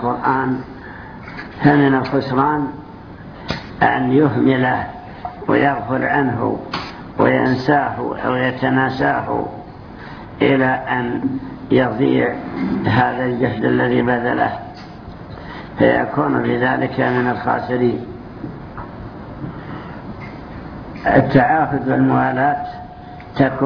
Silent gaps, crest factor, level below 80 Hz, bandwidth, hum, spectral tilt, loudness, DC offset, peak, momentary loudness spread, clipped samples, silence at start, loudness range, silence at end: none; 18 dB; -44 dBFS; 5.4 kHz; none; -8.5 dB/octave; -17 LUFS; under 0.1%; 0 dBFS; 18 LU; under 0.1%; 0 s; 3 LU; 0 s